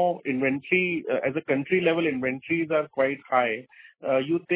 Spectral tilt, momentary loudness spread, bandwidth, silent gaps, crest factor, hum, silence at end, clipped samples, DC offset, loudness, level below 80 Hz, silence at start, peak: -9.5 dB/octave; 4 LU; 4 kHz; none; 16 dB; none; 0 s; under 0.1%; under 0.1%; -25 LUFS; -66 dBFS; 0 s; -8 dBFS